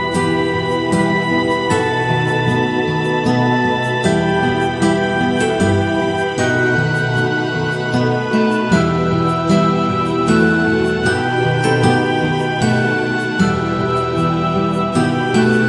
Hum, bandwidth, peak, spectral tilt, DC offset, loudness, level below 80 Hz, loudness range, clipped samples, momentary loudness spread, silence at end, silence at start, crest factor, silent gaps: none; 11.5 kHz; -2 dBFS; -6 dB/octave; under 0.1%; -16 LUFS; -44 dBFS; 1 LU; under 0.1%; 3 LU; 0 s; 0 s; 14 dB; none